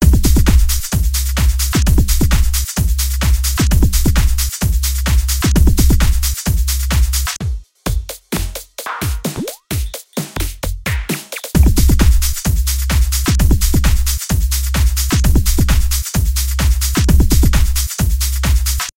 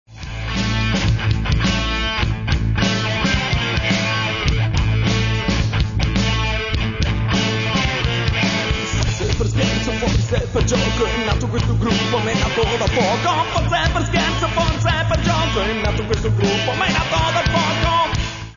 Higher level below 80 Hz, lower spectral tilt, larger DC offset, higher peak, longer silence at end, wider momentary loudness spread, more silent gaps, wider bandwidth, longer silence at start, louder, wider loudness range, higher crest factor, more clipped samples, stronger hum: first, -14 dBFS vs -26 dBFS; about the same, -4.5 dB/octave vs -5 dB/octave; second, under 0.1% vs 0.2%; first, 0 dBFS vs -4 dBFS; about the same, 0.05 s vs 0 s; first, 10 LU vs 3 LU; neither; first, 17 kHz vs 7.4 kHz; about the same, 0 s vs 0.1 s; about the same, -16 LUFS vs -18 LUFS; first, 7 LU vs 1 LU; about the same, 14 dB vs 14 dB; neither; neither